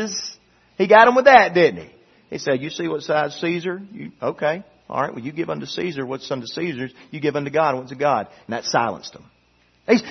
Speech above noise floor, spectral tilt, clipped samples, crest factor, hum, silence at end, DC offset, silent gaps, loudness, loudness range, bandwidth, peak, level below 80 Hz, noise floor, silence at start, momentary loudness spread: 40 dB; -4.5 dB/octave; under 0.1%; 20 dB; none; 0 s; under 0.1%; none; -20 LUFS; 10 LU; 6.4 kHz; 0 dBFS; -62 dBFS; -60 dBFS; 0 s; 19 LU